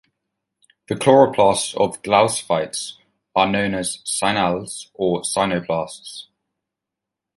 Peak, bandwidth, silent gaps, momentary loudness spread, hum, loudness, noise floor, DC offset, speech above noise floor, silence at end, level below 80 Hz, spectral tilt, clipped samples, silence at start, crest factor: -2 dBFS; 11.5 kHz; none; 16 LU; none; -19 LUFS; -84 dBFS; under 0.1%; 65 dB; 1.15 s; -54 dBFS; -4 dB/octave; under 0.1%; 0.9 s; 18 dB